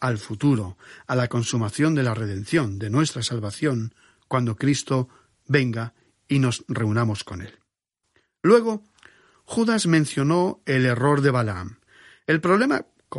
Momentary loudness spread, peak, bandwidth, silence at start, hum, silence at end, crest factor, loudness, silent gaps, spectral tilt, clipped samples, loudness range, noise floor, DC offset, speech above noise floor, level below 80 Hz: 14 LU; -4 dBFS; 11.5 kHz; 0 s; none; 0 s; 18 dB; -23 LUFS; none; -6 dB/octave; under 0.1%; 4 LU; -78 dBFS; under 0.1%; 56 dB; -58 dBFS